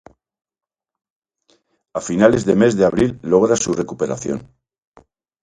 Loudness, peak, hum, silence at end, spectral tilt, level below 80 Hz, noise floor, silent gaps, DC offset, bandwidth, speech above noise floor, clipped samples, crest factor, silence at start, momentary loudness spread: -17 LUFS; 0 dBFS; none; 1 s; -5.5 dB/octave; -48 dBFS; -61 dBFS; none; under 0.1%; 9.6 kHz; 45 dB; under 0.1%; 20 dB; 1.95 s; 13 LU